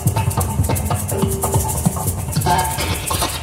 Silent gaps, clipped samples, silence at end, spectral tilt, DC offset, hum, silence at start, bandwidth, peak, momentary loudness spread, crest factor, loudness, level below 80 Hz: none; under 0.1%; 0 s; -4.5 dB/octave; under 0.1%; none; 0 s; 16.5 kHz; -2 dBFS; 3 LU; 16 dB; -19 LUFS; -30 dBFS